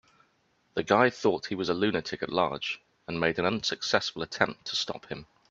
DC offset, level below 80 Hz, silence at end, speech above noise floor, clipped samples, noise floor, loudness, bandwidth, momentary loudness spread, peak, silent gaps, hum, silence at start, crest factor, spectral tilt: under 0.1%; -64 dBFS; 0.25 s; 41 dB; under 0.1%; -70 dBFS; -29 LUFS; 8 kHz; 12 LU; -4 dBFS; none; none; 0.75 s; 26 dB; -4 dB/octave